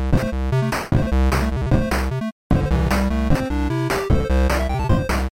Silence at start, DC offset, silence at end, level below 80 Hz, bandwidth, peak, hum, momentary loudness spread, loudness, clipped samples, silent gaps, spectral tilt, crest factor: 0 s; under 0.1%; 0.1 s; -22 dBFS; 16.5 kHz; -6 dBFS; none; 3 LU; -21 LUFS; under 0.1%; 2.32-2.50 s; -6.5 dB/octave; 12 dB